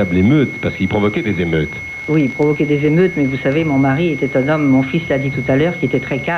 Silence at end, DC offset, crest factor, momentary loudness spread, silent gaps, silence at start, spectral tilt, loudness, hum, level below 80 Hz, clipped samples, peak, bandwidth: 0 s; under 0.1%; 12 dB; 5 LU; none; 0 s; -8 dB/octave; -16 LUFS; none; -42 dBFS; under 0.1%; -2 dBFS; 7.2 kHz